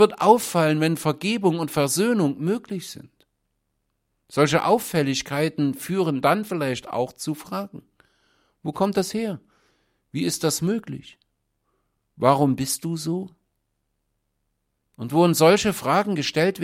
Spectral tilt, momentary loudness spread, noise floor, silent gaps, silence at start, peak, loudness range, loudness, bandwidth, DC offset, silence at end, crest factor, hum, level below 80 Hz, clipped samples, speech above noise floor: -5 dB/octave; 15 LU; -75 dBFS; none; 0 s; -2 dBFS; 5 LU; -22 LUFS; 16.5 kHz; under 0.1%; 0 s; 22 dB; none; -60 dBFS; under 0.1%; 53 dB